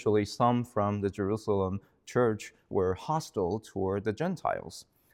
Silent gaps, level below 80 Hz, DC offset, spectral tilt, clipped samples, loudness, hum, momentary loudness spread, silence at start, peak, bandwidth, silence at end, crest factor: none; -64 dBFS; under 0.1%; -6.5 dB/octave; under 0.1%; -31 LUFS; none; 8 LU; 0 s; -12 dBFS; 15.5 kHz; 0.3 s; 18 dB